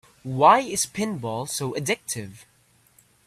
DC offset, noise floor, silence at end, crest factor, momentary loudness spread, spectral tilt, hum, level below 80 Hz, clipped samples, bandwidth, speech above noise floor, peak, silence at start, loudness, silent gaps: under 0.1%; -59 dBFS; 0.9 s; 22 dB; 15 LU; -3.5 dB/octave; none; -62 dBFS; under 0.1%; 15 kHz; 36 dB; -2 dBFS; 0.25 s; -23 LUFS; none